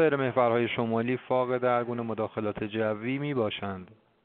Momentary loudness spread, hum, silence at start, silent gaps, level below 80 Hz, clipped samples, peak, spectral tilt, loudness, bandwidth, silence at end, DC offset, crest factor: 8 LU; none; 0 s; none; -66 dBFS; under 0.1%; -10 dBFS; -5 dB/octave; -29 LUFS; 4.4 kHz; 0.3 s; under 0.1%; 18 dB